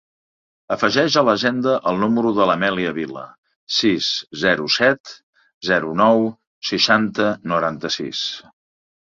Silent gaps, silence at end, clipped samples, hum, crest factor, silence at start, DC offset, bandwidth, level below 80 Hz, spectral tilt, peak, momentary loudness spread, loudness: 3.38-3.43 s, 3.56-3.67 s, 5.00-5.04 s, 5.23-5.33 s, 5.54-5.61 s, 6.47-6.62 s; 0.75 s; under 0.1%; none; 18 dB; 0.7 s; under 0.1%; 7.6 kHz; -58 dBFS; -4 dB/octave; -2 dBFS; 11 LU; -19 LUFS